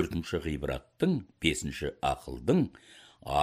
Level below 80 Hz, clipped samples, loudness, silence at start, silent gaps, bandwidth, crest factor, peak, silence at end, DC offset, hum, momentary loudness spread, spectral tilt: -48 dBFS; under 0.1%; -31 LUFS; 0 s; none; 15.5 kHz; 20 dB; -10 dBFS; 0 s; under 0.1%; none; 7 LU; -5.5 dB/octave